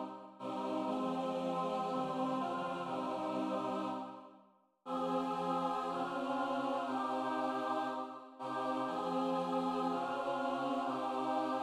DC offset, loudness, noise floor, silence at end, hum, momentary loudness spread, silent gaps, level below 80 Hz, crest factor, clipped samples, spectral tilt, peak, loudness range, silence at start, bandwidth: under 0.1%; -38 LUFS; -67 dBFS; 0 s; none; 7 LU; none; -82 dBFS; 14 dB; under 0.1%; -6 dB/octave; -22 dBFS; 2 LU; 0 s; 12.5 kHz